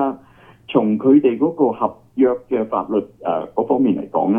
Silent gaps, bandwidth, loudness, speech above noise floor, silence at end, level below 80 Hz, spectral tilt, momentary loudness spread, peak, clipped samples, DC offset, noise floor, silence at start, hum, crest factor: none; 3.6 kHz; -18 LUFS; 30 dB; 0 s; -60 dBFS; -10 dB/octave; 10 LU; 0 dBFS; under 0.1%; under 0.1%; -47 dBFS; 0 s; none; 18 dB